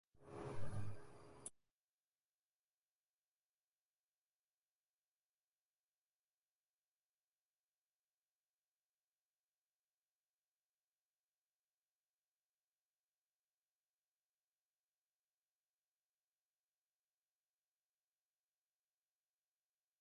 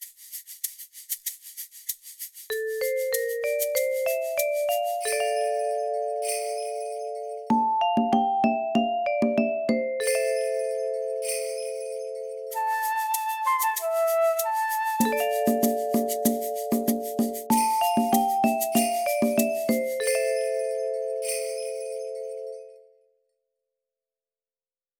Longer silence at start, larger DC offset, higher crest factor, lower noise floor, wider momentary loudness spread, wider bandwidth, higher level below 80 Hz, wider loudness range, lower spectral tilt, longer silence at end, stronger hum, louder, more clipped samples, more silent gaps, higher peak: first, 0.2 s vs 0 s; neither; first, 24 dB vs 18 dB; about the same, under -90 dBFS vs under -90 dBFS; about the same, 10 LU vs 11 LU; second, 11 kHz vs over 20 kHz; second, -78 dBFS vs -70 dBFS; about the same, 9 LU vs 7 LU; first, -5.5 dB/octave vs -3.5 dB/octave; first, 18.5 s vs 2.2 s; neither; second, -54 LUFS vs -26 LUFS; neither; neither; second, -32 dBFS vs -8 dBFS